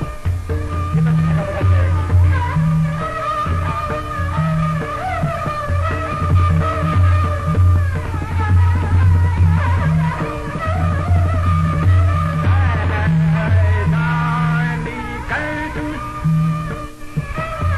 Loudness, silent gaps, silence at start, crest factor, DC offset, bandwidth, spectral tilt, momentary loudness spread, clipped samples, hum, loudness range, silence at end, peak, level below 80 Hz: -17 LUFS; none; 0 s; 12 dB; under 0.1%; 11.5 kHz; -8 dB/octave; 8 LU; under 0.1%; none; 4 LU; 0 s; -4 dBFS; -22 dBFS